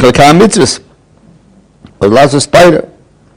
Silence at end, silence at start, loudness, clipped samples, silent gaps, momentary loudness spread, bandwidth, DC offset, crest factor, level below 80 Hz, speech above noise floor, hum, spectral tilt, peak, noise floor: 0.5 s; 0 s; -6 LUFS; 10%; none; 10 LU; over 20 kHz; under 0.1%; 8 dB; -34 dBFS; 38 dB; none; -4.5 dB/octave; 0 dBFS; -43 dBFS